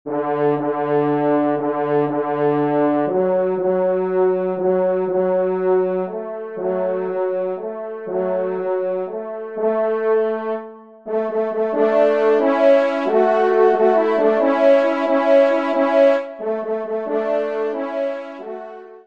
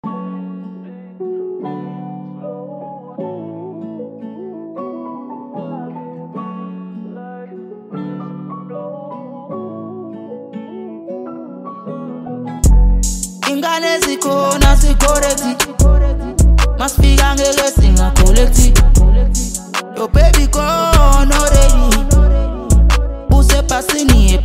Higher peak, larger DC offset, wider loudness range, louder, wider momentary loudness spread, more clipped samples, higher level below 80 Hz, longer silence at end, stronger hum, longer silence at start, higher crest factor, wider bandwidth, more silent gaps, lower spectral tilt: about the same, -2 dBFS vs 0 dBFS; first, 0.2% vs under 0.1%; second, 7 LU vs 16 LU; second, -19 LUFS vs -13 LUFS; second, 11 LU vs 19 LU; neither; second, -72 dBFS vs -14 dBFS; about the same, 0.05 s vs 0 s; neither; about the same, 0.05 s vs 0.05 s; about the same, 16 dB vs 12 dB; second, 7 kHz vs 16 kHz; neither; first, -8 dB/octave vs -4.5 dB/octave